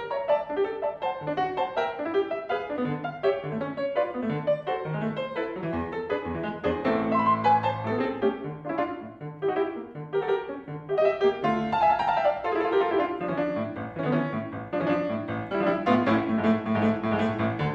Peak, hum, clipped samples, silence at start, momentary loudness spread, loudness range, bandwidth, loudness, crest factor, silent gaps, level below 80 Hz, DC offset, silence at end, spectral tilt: -8 dBFS; none; under 0.1%; 0 s; 8 LU; 4 LU; 7.4 kHz; -27 LUFS; 18 dB; none; -58 dBFS; under 0.1%; 0 s; -8 dB/octave